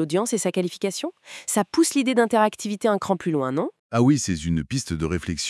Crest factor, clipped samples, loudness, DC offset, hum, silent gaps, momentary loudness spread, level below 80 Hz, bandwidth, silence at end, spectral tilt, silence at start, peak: 16 dB; under 0.1%; -23 LUFS; under 0.1%; none; 3.79-3.90 s; 8 LU; -50 dBFS; 12 kHz; 0 s; -5 dB/octave; 0 s; -6 dBFS